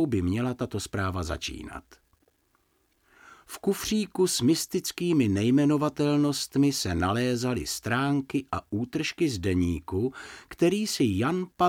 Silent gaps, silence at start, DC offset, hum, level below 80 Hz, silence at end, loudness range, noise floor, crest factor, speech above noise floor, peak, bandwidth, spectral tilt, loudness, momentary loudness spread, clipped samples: none; 0 s; under 0.1%; none; -50 dBFS; 0 s; 9 LU; -70 dBFS; 16 dB; 43 dB; -10 dBFS; 17.5 kHz; -5 dB/octave; -27 LUFS; 9 LU; under 0.1%